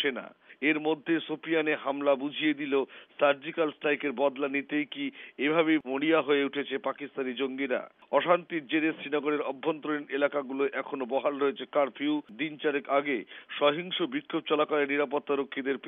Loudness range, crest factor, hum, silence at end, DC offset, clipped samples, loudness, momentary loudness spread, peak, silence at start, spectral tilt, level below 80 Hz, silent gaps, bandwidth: 2 LU; 18 dB; none; 0 s; under 0.1%; under 0.1%; -29 LUFS; 7 LU; -10 dBFS; 0 s; -2 dB/octave; -88 dBFS; none; 3.9 kHz